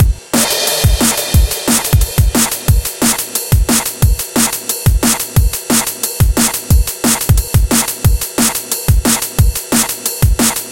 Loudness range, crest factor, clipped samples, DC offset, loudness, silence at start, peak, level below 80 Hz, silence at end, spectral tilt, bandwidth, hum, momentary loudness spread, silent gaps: 1 LU; 12 dB; under 0.1%; 0.3%; -13 LUFS; 0 s; 0 dBFS; -18 dBFS; 0 s; -3.5 dB/octave; 17.5 kHz; none; 3 LU; none